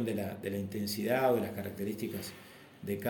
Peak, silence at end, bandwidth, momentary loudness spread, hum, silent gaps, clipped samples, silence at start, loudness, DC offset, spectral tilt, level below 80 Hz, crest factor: -18 dBFS; 0 s; 17 kHz; 16 LU; none; none; under 0.1%; 0 s; -34 LUFS; under 0.1%; -5.5 dB/octave; -70 dBFS; 18 dB